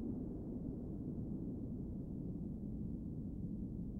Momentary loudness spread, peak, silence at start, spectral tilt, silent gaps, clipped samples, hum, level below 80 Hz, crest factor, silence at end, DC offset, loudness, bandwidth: 1 LU; -32 dBFS; 0 s; -12.5 dB/octave; none; under 0.1%; none; -52 dBFS; 12 dB; 0 s; under 0.1%; -45 LUFS; 1.9 kHz